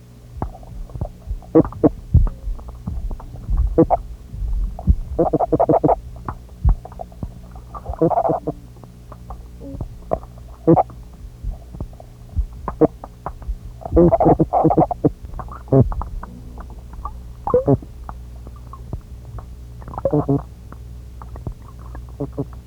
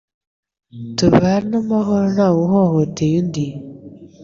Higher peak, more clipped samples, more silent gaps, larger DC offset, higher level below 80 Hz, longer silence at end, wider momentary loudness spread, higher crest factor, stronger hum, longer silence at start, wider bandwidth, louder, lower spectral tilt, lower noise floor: about the same, 0 dBFS vs -2 dBFS; neither; neither; neither; first, -28 dBFS vs -46 dBFS; about the same, 0.05 s vs 0 s; first, 22 LU vs 12 LU; first, 20 dB vs 14 dB; first, 60 Hz at -40 dBFS vs none; second, 0.1 s vs 0.75 s; first, 11 kHz vs 7.6 kHz; second, -20 LUFS vs -17 LUFS; first, -10.5 dB/octave vs -7 dB/octave; about the same, -40 dBFS vs -38 dBFS